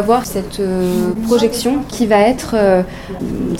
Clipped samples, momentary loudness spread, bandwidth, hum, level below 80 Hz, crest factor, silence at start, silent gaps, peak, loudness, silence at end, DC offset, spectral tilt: under 0.1%; 10 LU; 17 kHz; none; -36 dBFS; 14 dB; 0 s; none; 0 dBFS; -15 LUFS; 0 s; 0.2%; -5.5 dB/octave